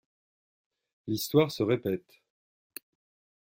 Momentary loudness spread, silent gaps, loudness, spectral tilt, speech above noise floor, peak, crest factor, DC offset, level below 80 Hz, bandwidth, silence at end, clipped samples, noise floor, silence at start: 21 LU; none; -29 LUFS; -6 dB/octave; over 62 dB; -10 dBFS; 22 dB; under 0.1%; -70 dBFS; 16 kHz; 1.4 s; under 0.1%; under -90 dBFS; 1.05 s